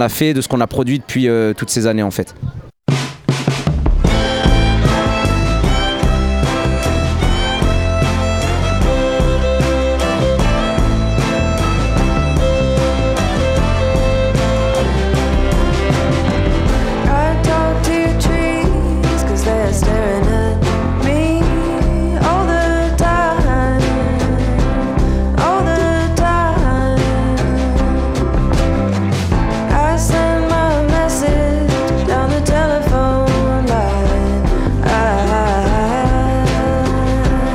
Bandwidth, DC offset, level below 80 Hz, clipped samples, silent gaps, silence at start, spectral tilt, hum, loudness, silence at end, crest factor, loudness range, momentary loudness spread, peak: 16.5 kHz; under 0.1%; -18 dBFS; under 0.1%; none; 0 s; -6 dB/octave; none; -15 LUFS; 0 s; 14 dB; 1 LU; 2 LU; 0 dBFS